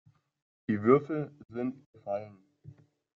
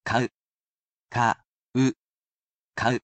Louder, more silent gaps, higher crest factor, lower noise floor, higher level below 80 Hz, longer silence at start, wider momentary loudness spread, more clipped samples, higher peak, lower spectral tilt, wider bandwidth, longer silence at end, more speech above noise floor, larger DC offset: second, -31 LUFS vs -27 LUFS; second, 1.86-1.93 s vs 0.34-1.08 s, 1.47-1.72 s, 1.98-2.37 s, 2.43-2.68 s; about the same, 22 dB vs 20 dB; second, -55 dBFS vs under -90 dBFS; second, -72 dBFS vs -60 dBFS; first, 0.7 s vs 0.05 s; first, 19 LU vs 11 LU; neither; about the same, -10 dBFS vs -8 dBFS; first, -8.5 dB/octave vs -5.5 dB/octave; second, 4.3 kHz vs 8.6 kHz; first, 0.45 s vs 0.05 s; second, 25 dB vs over 66 dB; neither